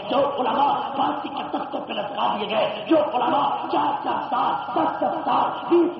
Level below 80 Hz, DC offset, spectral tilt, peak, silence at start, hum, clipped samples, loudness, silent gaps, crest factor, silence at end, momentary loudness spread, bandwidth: -68 dBFS; under 0.1%; -2.5 dB/octave; -8 dBFS; 0 s; none; under 0.1%; -23 LUFS; none; 14 dB; 0 s; 8 LU; 5.8 kHz